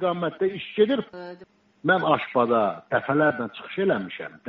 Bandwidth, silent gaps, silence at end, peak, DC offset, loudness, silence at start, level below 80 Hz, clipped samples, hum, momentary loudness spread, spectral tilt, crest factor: 5.6 kHz; none; 0 s; -6 dBFS; under 0.1%; -24 LUFS; 0 s; -68 dBFS; under 0.1%; none; 11 LU; -4 dB/octave; 18 dB